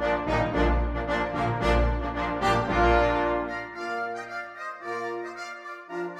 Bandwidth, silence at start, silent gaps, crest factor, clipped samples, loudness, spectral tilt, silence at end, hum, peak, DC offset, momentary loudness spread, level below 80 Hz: 10.5 kHz; 0 s; none; 18 dB; under 0.1%; -27 LUFS; -6.5 dB/octave; 0 s; none; -10 dBFS; under 0.1%; 14 LU; -34 dBFS